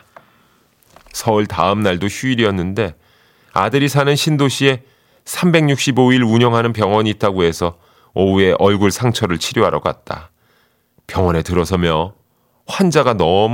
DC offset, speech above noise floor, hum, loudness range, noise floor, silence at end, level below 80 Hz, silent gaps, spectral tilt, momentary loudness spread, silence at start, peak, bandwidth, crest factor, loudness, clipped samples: under 0.1%; 44 dB; none; 4 LU; -59 dBFS; 0 s; -42 dBFS; none; -5.5 dB/octave; 10 LU; 1.15 s; 0 dBFS; 17 kHz; 16 dB; -16 LUFS; under 0.1%